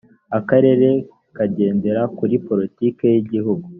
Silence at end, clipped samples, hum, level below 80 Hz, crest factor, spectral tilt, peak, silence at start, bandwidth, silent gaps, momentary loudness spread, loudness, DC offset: 0 s; under 0.1%; none; -60 dBFS; 16 dB; -8.5 dB/octave; -2 dBFS; 0.3 s; 3.6 kHz; none; 9 LU; -18 LUFS; under 0.1%